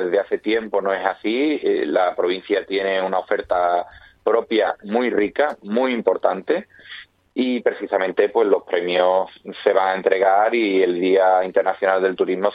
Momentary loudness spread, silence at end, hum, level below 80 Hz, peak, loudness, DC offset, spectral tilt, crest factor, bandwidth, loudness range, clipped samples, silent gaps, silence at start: 6 LU; 0 s; none; -62 dBFS; -2 dBFS; -20 LUFS; under 0.1%; -7.5 dB/octave; 18 dB; 5 kHz; 3 LU; under 0.1%; none; 0 s